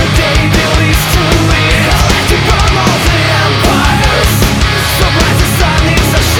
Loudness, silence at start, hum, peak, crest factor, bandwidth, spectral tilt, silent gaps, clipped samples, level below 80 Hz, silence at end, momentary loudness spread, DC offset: -9 LUFS; 0 s; none; 0 dBFS; 8 dB; 20 kHz; -4.5 dB/octave; none; under 0.1%; -16 dBFS; 0 s; 1 LU; 0.3%